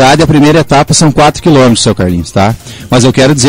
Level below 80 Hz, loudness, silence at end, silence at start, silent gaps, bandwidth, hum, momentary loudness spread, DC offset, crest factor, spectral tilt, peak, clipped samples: -28 dBFS; -7 LUFS; 0 s; 0 s; none; 16.5 kHz; none; 6 LU; under 0.1%; 6 dB; -5 dB/octave; 0 dBFS; 0.8%